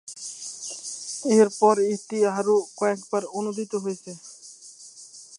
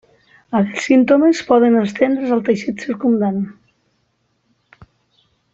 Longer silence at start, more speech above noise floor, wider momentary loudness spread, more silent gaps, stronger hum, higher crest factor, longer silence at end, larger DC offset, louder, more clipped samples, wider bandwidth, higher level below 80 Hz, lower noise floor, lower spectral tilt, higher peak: second, 0.05 s vs 0.5 s; second, 24 dB vs 50 dB; first, 23 LU vs 9 LU; neither; neither; about the same, 20 dB vs 16 dB; second, 0 s vs 2 s; neither; second, -24 LUFS vs -16 LUFS; neither; first, 11.5 kHz vs 8 kHz; second, -80 dBFS vs -60 dBFS; second, -46 dBFS vs -65 dBFS; second, -4.5 dB/octave vs -6.5 dB/octave; second, -6 dBFS vs -2 dBFS